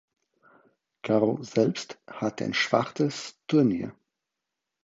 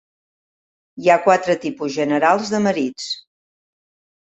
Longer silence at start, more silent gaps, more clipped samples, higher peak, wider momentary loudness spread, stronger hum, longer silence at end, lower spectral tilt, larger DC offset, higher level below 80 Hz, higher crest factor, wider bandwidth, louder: about the same, 1.05 s vs 0.95 s; neither; neither; second, -6 dBFS vs -2 dBFS; about the same, 13 LU vs 11 LU; neither; about the same, 0.95 s vs 1.05 s; about the same, -5.5 dB/octave vs -4.5 dB/octave; neither; about the same, -68 dBFS vs -66 dBFS; about the same, 22 dB vs 20 dB; about the same, 8 kHz vs 8.4 kHz; second, -27 LUFS vs -18 LUFS